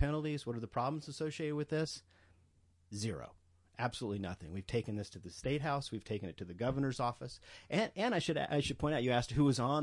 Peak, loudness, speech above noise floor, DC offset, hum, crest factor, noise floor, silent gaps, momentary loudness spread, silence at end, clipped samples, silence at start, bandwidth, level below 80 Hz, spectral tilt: -20 dBFS; -37 LUFS; 33 dB; under 0.1%; none; 18 dB; -69 dBFS; none; 13 LU; 0 s; under 0.1%; 0 s; 11.5 kHz; -58 dBFS; -6 dB/octave